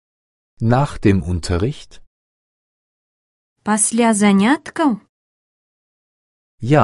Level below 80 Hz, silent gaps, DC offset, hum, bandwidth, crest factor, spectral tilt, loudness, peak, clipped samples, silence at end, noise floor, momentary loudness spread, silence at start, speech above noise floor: -38 dBFS; 2.07-3.56 s, 5.09-6.58 s; under 0.1%; none; 11.5 kHz; 20 dB; -5.5 dB/octave; -17 LUFS; 0 dBFS; under 0.1%; 0 s; under -90 dBFS; 13 LU; 0.6 s; over 74 dB